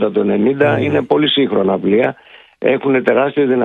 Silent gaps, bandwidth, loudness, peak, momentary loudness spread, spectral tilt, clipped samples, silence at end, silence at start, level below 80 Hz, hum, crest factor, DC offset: none; 4.2 kHz; -14 LUFS; 0 dBFS; 3 LU; -8 dB/octave; under 0.1%; 0 s; 0 s; -56 dBFS; none; 14 dB; under 0.1%